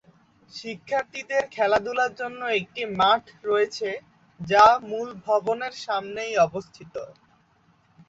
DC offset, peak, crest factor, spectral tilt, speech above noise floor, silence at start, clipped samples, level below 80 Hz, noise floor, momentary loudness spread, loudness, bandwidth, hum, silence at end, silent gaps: under 0.1%; -4 dBFS; 22 dB; -4 dB/octave; 38 dB; 0.55 s; under 0.1%; -62 dBFS; -62 dBFS; 19 LU; -24 LUFS; 8 kHz; none; 0.95 s; none